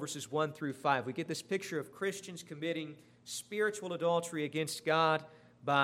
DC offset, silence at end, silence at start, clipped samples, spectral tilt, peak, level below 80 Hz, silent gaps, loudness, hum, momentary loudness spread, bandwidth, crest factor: under 0.1%; 0 s; 0 s; under 0.1%; -4 dB/octave; -14 dBFS; -82 dBFS; none; -35 LUFS; 60 Hz at -65 dBFS; 12 LU; 16 kHz; 22 dB